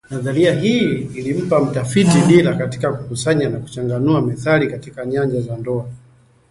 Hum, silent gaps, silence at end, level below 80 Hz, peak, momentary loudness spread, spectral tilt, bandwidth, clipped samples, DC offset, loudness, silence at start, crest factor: none; none; 0.55 s; -48 dBFS; 0 dBFS; 11 LU; -6.5 dB/octave; 11.5 kHz; under 0.1%; under 0.1%; -17 LUFS; 0.1 s; 16 dB